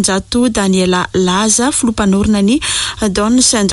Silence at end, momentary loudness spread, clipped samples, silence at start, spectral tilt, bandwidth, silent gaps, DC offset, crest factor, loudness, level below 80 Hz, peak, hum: 0 s; 4 LU; under 0.1%; 0 s; -3.5 dB/octave; 11.5 kHz; none; under 0.1%; 12 dB; -12 LUFS; -34 dBFS; 0 dBFS; none